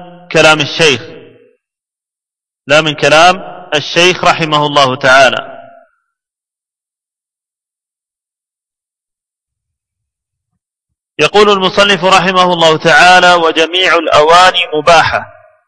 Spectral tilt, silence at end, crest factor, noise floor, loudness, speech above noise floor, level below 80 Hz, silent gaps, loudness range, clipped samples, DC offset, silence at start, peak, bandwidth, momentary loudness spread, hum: -3 dB/octave; 0.4 s; 12 dB; -86 dBFS; -8 LUFS; 79 dB; -44 dBFS; none; 8 LU; 1%; under 0.1%; 0 s; 0 dBFS; 11 kHz; 8 LU; none